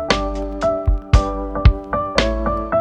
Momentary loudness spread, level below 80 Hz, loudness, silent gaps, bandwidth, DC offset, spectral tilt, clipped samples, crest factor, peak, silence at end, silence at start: 5 LU; -20 dBFS; -19 LUFS; none; 9 kHz; under 0.1%; -6 dB/octave; under 0.1%; 18 dB; 0 dBFS; 0 s; 0 s